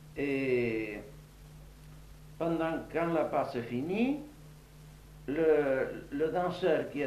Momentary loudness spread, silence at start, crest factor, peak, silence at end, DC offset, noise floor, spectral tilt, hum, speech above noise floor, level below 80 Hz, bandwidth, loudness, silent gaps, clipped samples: 25 LU; 0 s; 18 dB; -16 dBFS; 0 s; under 0.1%; -52 dBFS; -7 dB/octave; none; 22 dB; -56 dBFS; 14 kHz; -32 LUFS; none; under 0.1%